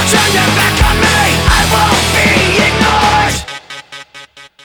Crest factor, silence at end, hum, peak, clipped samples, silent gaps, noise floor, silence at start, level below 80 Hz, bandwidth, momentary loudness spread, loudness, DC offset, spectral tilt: 12 dB; 0.2 s; none; 0 dBFS; under 0.1%; none; -36 dBFS; 0 s; -22 dBFS; over 20 kHz; 18 LU; -9 LUFS; under 0.1%; -3.5 dB/octave